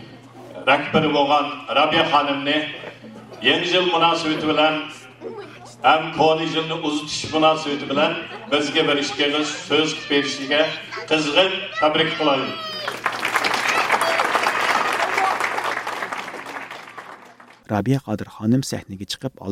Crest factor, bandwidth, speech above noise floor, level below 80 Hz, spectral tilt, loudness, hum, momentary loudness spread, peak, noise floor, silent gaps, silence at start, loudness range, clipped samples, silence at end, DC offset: 18 dB; 16 kHz; 26 dB; -62 dBFS; -4 dB/octave; -20 LUFS; none; 15 LU; -2 dBFS; -46 dBFS; none; 0 s; 5 LU; under 0.1%; 0 s; under 0.1%